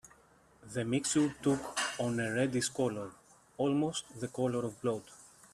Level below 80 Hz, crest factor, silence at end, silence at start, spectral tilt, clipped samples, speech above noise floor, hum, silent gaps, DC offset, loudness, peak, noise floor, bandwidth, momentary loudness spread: -68 dBFS; 16 dB; 0.25 s; 0.05 s; -4.5 dB/octave; under 0.1%; 31 dB; none; none; under 0.1%; -34 LUFS; -18 dBFS; -64 dBFS; 13.5 kHz; 11 LU